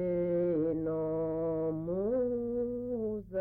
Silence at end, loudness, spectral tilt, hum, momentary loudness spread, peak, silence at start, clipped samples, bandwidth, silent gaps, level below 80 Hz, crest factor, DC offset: 0 s; -33 LUFS; -12.5 dB/octave; none; 5 LU; -24 dBFS; 0 s; under 0.1%; 3.1 kHz; none; -56 dBFS; 8 dB; under 0.1%